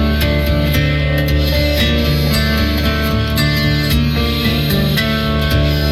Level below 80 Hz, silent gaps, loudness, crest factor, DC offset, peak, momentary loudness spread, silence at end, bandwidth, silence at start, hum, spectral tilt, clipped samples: -20 dBFS; none; -15 LUFS; 10 dB; under 0.1%; -4 dBFS; 2 LU; 0 s; 16 kHz; 0 s; none; -5.5 dB/octave; under 0.1%